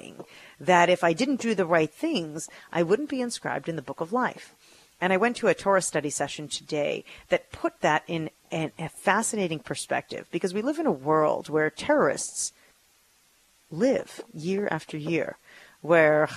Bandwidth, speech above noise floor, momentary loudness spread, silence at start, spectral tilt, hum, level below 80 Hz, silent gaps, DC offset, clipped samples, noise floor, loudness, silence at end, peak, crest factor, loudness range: 14 kHz; 37 dB; 11 LU; 0.05 s; -4.5 dB/octave; none; -66 dBFS; none; under 0.1%; under 0.1%; -63 dBFS; -26 LUFS; 0 s; -4 dBFS; 22 dB; 4 LU